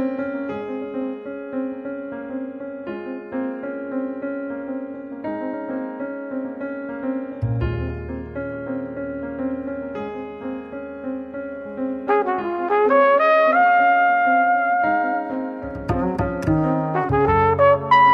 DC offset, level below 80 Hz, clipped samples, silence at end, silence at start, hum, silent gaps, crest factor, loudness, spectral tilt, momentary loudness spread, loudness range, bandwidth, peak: under 0.1%; -42 dBFS; under 0.1%; 0 s; 0 s; none; none; 18 dB; -22 LUFS; -8.5 dB/octave; 16 LU; 12 LU; 7.2 kHz; -4 dBFS